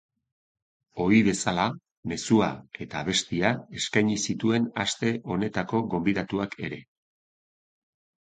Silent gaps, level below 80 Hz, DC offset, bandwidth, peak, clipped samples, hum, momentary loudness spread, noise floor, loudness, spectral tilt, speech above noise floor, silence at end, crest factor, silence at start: 1.91-2.03 s; -56 dBFS; under 0.1%; 9.4 kHz; -6 dBFS; under 0.1%; none; 13 LU; under -90 dBFS; -26 LUFS; -4.5 dB/octave; over 64 dB; 1.4 s; 22 dB; 0.95 s